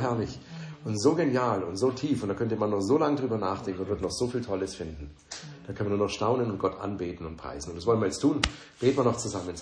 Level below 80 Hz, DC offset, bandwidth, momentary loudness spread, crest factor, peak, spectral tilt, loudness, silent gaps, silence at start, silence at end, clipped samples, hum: -50 dBFS; under 0.1%; 10.5 kHz; 14 LU; 26 dB; -2 dBFS; -5.5 dB/octave; -29 LUFS; none; 0 s; 0 s; under 0.1%; none